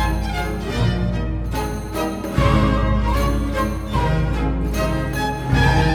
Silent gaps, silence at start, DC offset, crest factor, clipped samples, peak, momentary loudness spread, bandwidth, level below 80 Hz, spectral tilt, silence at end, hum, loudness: none; 0 s; under 0.1%; 16 dB; under 0.1%; -2 dBFS; 8 LU; 17 kHz; -24 dBFS; -6.5 dB/octave; 0 s; none; -21 LUFS